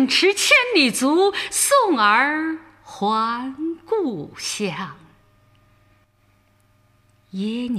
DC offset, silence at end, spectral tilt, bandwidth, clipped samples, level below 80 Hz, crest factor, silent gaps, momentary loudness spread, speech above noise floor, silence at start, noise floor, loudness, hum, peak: under 0.1%; 0 s; -2.5 dB/octave; 15.5 kHz; under 0.1%; -64 dBFS; 18 dB; none; 15 LU; 40 dB; 0 s; -60 dBFS; -19 LUFS; none; -4 dBFS